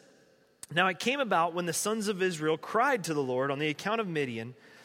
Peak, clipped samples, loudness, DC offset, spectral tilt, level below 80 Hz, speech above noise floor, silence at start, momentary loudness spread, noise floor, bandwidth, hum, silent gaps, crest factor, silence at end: -10 dBFS; under 0.1%; -30 LUFS; under 0.1%; -4 dB/octave; -78 dBFS; 33 dB; 0.7 s; 6 LU; -63 dBFS; 16 kHz; none; none; 20 dB; 0 s